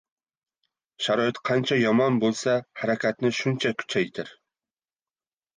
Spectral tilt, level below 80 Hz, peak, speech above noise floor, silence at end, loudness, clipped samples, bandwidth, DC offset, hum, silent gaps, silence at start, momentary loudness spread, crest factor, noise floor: -5 dB/octave; -70 dBFS; -10 dBFS; over 66 dB; 1.25 s; -25 LUFS; under 0.1%; 9.8 kHz; under 0.1%; none; none; 1 s; 8 LU; 16 dB; under -90 dBFS